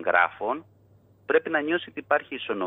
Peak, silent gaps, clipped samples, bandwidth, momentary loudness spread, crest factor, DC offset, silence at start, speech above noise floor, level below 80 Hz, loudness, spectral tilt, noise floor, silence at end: -6 dBFS; none; under 0.1%; 4 kHz; 10 LU; 20 dB; under 0.1%; 0 s; 32 dB; -74 dBFS; -26 LUFS; -7.5 dB/octave; -58 dBFS; 0 s